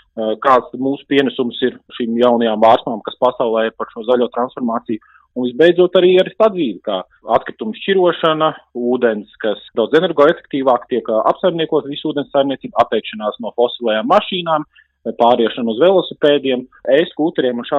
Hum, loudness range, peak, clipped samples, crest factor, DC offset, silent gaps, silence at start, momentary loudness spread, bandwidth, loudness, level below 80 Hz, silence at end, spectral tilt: none; 2 LU; 0 dBFS; under 0.1%; 16 dB; under 0.1%; none; 0.15 s; 10 LU; 6.8 kHz; -16 LUFS; -60 dBFS; 0 s; -7 dB/octave